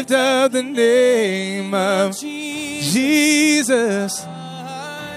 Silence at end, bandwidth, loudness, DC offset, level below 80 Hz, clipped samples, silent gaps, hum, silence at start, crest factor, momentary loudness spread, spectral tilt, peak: 0 s; 15.5 kHz; -17 LUFS; under 0.1%; -62 dBFS; under 0.1%; none; none; 0 s; 14 dB; 15 LU; -3.5 dB/octave; -4 dBFS